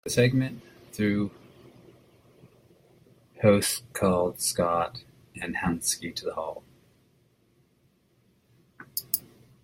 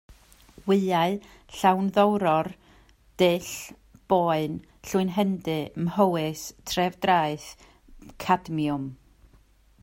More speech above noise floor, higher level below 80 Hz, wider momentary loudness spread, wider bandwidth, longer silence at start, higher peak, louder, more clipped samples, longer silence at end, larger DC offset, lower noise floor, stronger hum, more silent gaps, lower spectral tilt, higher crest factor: first, 40 dB vs 33 dB; about the same, -58 dBFS vs -56 dBFS; about the same, 15 LU vs 14 LU; about the same, 16.5 kHz vs 16.5 kHz; about the same, 0.05 s vs 0.1 s; first, -4 dBFS vs -8 dBFS; about the same, -27 LUFS vs -25 LUFS; neither; second, 0.45 s vs 0.85 s; neither; first, -66 dBFS vs -58 dBFS; neither; neither; about the same, -4.5 dB/octave vs -5.5 dB/octave; first, 24 dB vs 18 dB